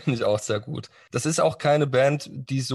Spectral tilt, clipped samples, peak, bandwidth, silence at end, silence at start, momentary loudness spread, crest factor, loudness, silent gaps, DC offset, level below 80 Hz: -5 dB/octave; under 0.1%; -8 dBFS; 12.5 kHz; 0 s; 0 s; 11 LU; 16 dB; -24 LUFS; none; under 0.1%; -60 dBFS